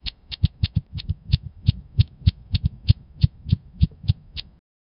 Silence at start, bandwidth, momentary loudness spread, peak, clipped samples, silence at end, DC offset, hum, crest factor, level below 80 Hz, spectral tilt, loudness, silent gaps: 0.05 s; 5.6 kHz; 9 LU; 0 dBFS; under 0.1%; 0.6 s; under 0.1%; none; 22 dB; -30 dBFS; -10.5 dB/octave; -25 LUFS; none